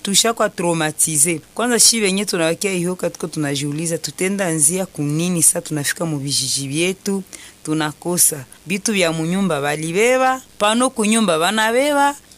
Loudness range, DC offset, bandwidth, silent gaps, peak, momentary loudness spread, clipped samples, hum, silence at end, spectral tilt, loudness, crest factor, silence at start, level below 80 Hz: 3 LU; under 0.1%; 15.5 kHz; none; -2 dBFS; 9 LU; under 0.1%; none; 0.2 s; -3 dB/octave; -17 LUFS; 16 dB; 0.05 s; -58 dBFS